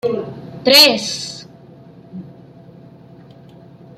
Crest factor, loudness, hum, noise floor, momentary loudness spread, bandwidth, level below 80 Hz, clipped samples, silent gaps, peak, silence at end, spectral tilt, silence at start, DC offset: 20 dB; -12 LUFS; none; -42 dBFS; 28 LU; 16 kHz; -62 dBFS; under 0.1%; none; 0 dBFS; 1.7 s; -2 dB/octave; 0.05 s; under 0.1%